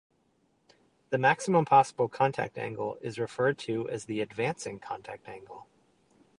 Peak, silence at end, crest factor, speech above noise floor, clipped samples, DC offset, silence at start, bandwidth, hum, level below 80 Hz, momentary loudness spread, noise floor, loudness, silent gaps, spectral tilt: -8 dBFS; 0.8 s; 22 dB; 42 dB; under 0.1%; under 0.1%; 1.1 s; 11 kHz; none; -70 dBFS; 20 LU; -71 dBFS; -29 LUFS; none; -5.5 dB/octave